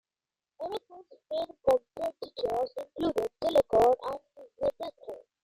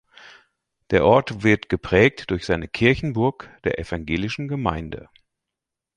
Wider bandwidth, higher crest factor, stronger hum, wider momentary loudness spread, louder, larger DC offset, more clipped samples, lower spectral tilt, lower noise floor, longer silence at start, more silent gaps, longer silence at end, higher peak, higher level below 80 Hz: first, 16 kHz vs 10.5 kHz; about the same, 18 dB vs 20 dB; neither; first, 17 LU vs 11 LU; second, -30 LUFS vs -21 LUFS; neither; neither; about the same, -5.5 dB/octave vs -6.5 dB/octave; first, under -90 dBFS vs -85 dBFS; first, 0.6 s vs 0.25 s; neither; second, 0.25 s vs 1 s; second, -12 dBFS vs -2 dBFS; second, -60 dBFS vs -42 dBFS